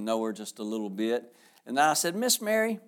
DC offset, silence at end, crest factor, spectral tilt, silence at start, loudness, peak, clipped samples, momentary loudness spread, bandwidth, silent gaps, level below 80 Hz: under 0.1%; 0.1 s; 18 dB; -2.5 dB/octave; 0 s; -28 LUFS; -10 dBFS; under 0.1%; 10 LU; over 20 kHz; none; -88 dBFS